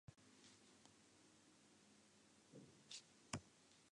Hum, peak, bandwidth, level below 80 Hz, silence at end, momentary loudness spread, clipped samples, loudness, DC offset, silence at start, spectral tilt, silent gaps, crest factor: none; -26 dBFS; 10.5 kHz; -82 dBFS; 0 s; 15 LU; under 0.1%; -60 LUFS; under 0.1%; 0.1 s; -3 dB/octave; none; 36 dB